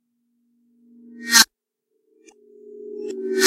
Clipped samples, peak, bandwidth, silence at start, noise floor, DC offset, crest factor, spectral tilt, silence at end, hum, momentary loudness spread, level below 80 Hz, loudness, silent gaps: under 0.1%; 0 dBFS; 16 kHz; 1.15 s; -76 dBFS; under 0.1%; 24 dB; 1 dB/octave; 0 s; none; 23 LU; -70 dBFS; -16 LUFS; none